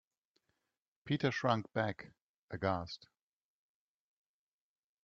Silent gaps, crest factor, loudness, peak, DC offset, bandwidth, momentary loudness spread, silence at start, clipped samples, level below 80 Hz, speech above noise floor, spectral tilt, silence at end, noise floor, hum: 2.22-2.48 s; 24 dB; -36 LUFS; -18 dBFS; under 0.1%; 7.4 kHz; 17 LU; 1.05 s; under 0.1%; -72 dBFS; over 54 dB; -6.5 dB/octave; 2.1 s; under -90 dBFS; none